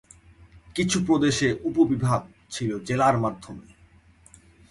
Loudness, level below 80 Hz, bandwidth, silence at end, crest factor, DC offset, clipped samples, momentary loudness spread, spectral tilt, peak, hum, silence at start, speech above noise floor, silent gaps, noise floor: -24 LUFS; -52 dBFS; 11.5 kHz; 1.1 s; 18 dB; under 0.1%; under 0.1%; 15 LU; -5.5 dB/octave; -8 dBFS; none; 0.55 s; 32 dB; none; -55 dBFS